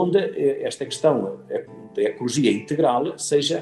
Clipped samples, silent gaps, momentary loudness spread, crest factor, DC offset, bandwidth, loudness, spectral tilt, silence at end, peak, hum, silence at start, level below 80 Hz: under 0.1%; none; 10 LU; 16 dB; under 0.1%; 12 kHz; -23 LUFS; -4.5 dB/octave; 0 s; -4 dBFS; none; 0 s; -70 dBFS